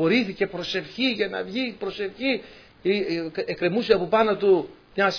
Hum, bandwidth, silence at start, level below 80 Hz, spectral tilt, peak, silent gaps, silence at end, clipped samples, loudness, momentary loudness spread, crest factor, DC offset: none; 5.4 kHz; 0 s; -58 dBFS; -6 dB/octave; -4 dBFS; none; 0 s; under 0.1%; -24 LUFS; 9 LU; 20 dB; under 0.1%